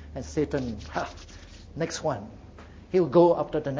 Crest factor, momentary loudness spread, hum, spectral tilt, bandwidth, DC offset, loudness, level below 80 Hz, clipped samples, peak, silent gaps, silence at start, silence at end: 20 dB; 25 LU; none; -6.5 dB/octave; 8 kHz; under 0.1%; -26 LUFS; -48 dBFS; under 0.1%; -6 dBFS; none; 0 s; 0 s